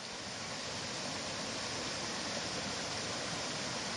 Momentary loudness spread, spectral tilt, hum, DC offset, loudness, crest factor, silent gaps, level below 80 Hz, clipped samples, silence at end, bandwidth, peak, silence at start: 3 LU; -2 dB/octave; none; under 0.1%; -38 LUFS; 16 dB; none; -66 dBFS; under 0.1%; 0 s; 11.5 kHz; -24 dBFS; 0 s